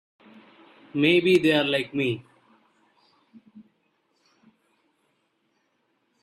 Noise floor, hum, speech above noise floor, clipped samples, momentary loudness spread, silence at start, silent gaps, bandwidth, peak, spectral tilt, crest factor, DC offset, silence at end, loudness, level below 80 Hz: -72 dBFS; none; 50 dB; under 0.1%; 12 LU; 0.95 s; none; 13.5 kHz; -6 dBFS; -6 dB/octave; 22 dB; under 0.1%; 2.6 s; -22 LUFS; -68 dBFS